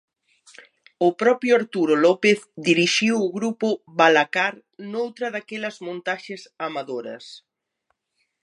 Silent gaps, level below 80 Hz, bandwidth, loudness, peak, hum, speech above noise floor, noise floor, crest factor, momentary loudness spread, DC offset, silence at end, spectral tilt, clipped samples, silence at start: none; -78 dBFS; 11 kHz; -21 LUFS; -2 dBFS; none; 53 dB; -74 dBFS; 22 dB; 15 LU; under 0.1%; 1.1 s; -4 dB/octave; under 0.1%; 1 s